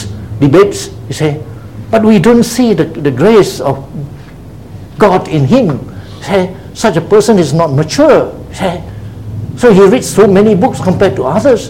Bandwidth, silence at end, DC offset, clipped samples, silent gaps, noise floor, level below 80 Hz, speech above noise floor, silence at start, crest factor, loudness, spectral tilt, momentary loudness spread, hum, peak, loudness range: 16.5 kHz; 0 s; 0.8%; 1%; none; -29 dBFS; -36 dBFS; 21 dB; 0 s; 10 dB; -9 LUFS; -6.5 dB/octave; 18 LU; none; 0 dBFS; 3 LU